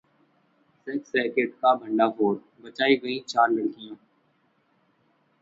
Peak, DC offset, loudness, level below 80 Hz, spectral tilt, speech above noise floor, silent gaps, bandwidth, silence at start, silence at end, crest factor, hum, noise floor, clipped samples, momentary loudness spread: -8 dBFS; under 0.1%; -25 LUFS; -74 dBFS; -5 dB/octave; 43 dB; none; 7.8 kHz; 0.85 s; 1.45 s; 20 dB; none; -67 dBFS; under 0.1%; 17 LU